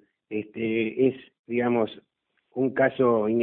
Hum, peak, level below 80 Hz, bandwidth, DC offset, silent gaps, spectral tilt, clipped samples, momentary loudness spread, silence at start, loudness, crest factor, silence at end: none; -8 dBFS; -68 dBFS; 4.1 kHz; under 0.1%; 1.39-1.44 s; -11 dB/octave; under 0.1%; 12 LU; 0.3 s; -26 LUFS; 18 dB; 0 s